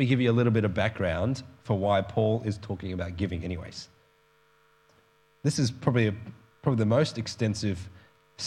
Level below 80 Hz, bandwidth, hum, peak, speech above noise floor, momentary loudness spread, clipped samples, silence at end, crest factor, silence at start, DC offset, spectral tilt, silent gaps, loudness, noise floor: -58 dBFS; 11 kHz; none; -8 dBFS; 37 dB; 14 LU; under 0.1%; 0 s; 20 dB; 0 s; under 0.1%; -6.5 dB/octave; none; -28 LUFS; -64 dBFS